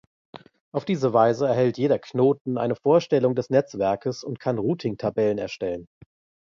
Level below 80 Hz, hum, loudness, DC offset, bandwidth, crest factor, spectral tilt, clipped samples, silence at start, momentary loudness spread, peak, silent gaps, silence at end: -62 dBFS; none; -23 LUFS; under 0.1%; 7.4 kHz; 18 dB; -7.5 dB/octave; under 0.1%; 0.35 s; 10 LU; -6 dBFS; 0.61-0.72 s, 2.41-2.45 s; 0.65 s